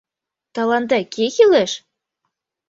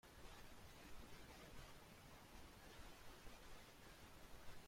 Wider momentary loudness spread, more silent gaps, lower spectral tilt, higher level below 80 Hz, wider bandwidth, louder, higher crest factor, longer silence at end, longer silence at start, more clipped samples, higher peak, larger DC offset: first, 14 LU vs 2 LU; neither; about the same, -3.5 dB/octave vs -3.5 dB/octave; about the same, -66 dBFS vs -66 dBFS; second, 7.8 kHz vs 16.5 kHz; first, -17 LUFS vs -62 LUFS; about the same, 18 dB vs 16 dB; first, 0.9 s vs 0 s; first, 0.55 s vs 0.05 s; neither; first, -2 dBFS vs -42 dBFS; neither